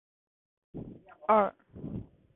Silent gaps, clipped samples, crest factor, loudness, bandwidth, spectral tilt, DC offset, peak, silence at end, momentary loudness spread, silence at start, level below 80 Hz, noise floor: none; under 0.1%; 22 dB; -29 LUFS; 4 kHz; -10.5 dB/octave; under 0.1%; -12 dBFS; 0.35 s; 21 LU; 0.75 s; -60 dBFS; -47 dBFS